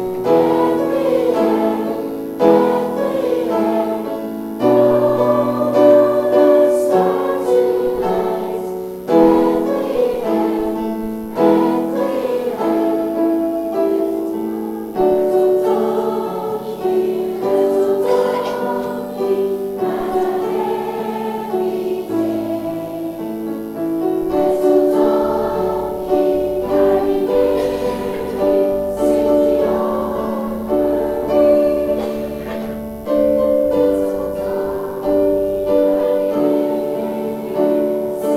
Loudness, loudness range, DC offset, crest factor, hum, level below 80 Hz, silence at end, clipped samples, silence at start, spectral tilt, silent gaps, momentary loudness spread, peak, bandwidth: -17 LUFS; 5 LU; under 0.1%; 16 dB; none; -44 dBFS; 0 s; under 0.1%; 0 s; -7 dB/octave; none; 9 LU; 0 dBFS; 16 kHz